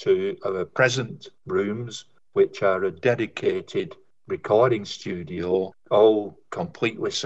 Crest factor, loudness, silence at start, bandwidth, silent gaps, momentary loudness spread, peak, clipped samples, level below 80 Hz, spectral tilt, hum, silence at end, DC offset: 18 dB; -24 LUFS; 0 s; 8.2 kHz; none; 14 LU; -6 dBFS; under 0.1%; -64 dBFS; -5 dB/octave; none; 0 s; 0.2%